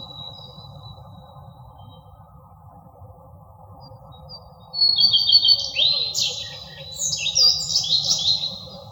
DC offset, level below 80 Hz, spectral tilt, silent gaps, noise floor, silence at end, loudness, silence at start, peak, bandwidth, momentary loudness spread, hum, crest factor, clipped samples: under 0.1%; -54 dBFS; 0 dB/octave; none; -47 dBFS; 0 s; -17 LUFS; 0 s; -4 dBFS; over 20 kHz; 23 LU; none; 20 dB; under 0.1%